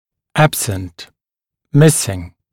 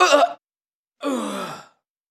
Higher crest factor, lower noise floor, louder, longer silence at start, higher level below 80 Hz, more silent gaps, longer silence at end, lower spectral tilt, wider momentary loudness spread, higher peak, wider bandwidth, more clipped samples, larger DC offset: second, 16 dB vs 22 dB; second, -85 dBFS vs under -90 dBFS; first, -15 LUFS vs -23 LUFS; first, 0.35 s vs 0 s; first, -46 dBFS vs -84 dBFS; second, none vs 0.75-0.83 s; second, 0.25 s vs 0.5 s; first, -5 dB/octave vs -2.5 dB/octave; second, 16 LU vs 22 LU; about the same, 0 dBFS vs 0 dBFS; first, 17 kHz vs 15 kHz; neither; neither